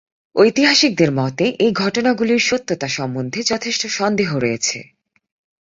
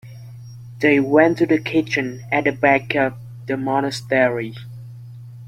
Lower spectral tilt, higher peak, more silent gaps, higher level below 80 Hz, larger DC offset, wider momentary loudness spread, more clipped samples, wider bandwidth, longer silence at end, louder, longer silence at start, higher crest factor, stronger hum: second, -4 dB/octave vs -6.5 dB/octave; about the same, -2 dBFS vs -2 dBFS; neither; about the same, -58 dBFS vs -56 dBFS; neither; second, 9 LU vs 23 LU; neither; second, 7.8 kHz vs 14.5 kHz; first, 0.75 s vs 0 s; about the same, -17 LUFS vs -19 LUFS; first, 0.35 s vs 0.05 s; about the same, 16 dB vs 18 dB; neither